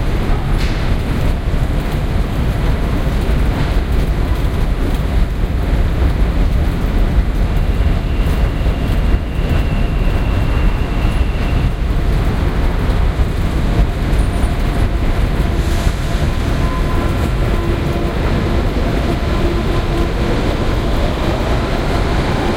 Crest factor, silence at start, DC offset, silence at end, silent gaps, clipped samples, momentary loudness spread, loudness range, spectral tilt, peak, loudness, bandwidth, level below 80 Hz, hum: 14 dB; 0 s; under 0.1%; 0 s; none; under 0.1%; 2 LU; 1 LU; -7 dB/octave; 0 dBFS; -17 LUFS; 16 kHz; -16 dBFS; none